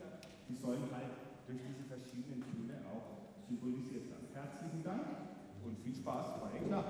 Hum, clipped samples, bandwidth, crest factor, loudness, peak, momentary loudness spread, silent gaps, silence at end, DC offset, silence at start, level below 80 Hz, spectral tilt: none; under 0.1%; over 20 kHz; 18 dB; -46 LUFS; -26 dBFS; 8 LU; none; 0 s; under 0.1%; 0 s; -74 dBFS; -7 dB/octave